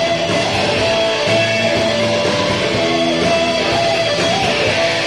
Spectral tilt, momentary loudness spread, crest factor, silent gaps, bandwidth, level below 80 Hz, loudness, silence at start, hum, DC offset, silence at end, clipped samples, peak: -3.5 dB/octave; 1 LU; 12 dB; none; 12.5 kHz; -42 dBFS; -15 LUFS; 0 s; none; 0.3%; 0 s; under 0.1%; -4 dBFS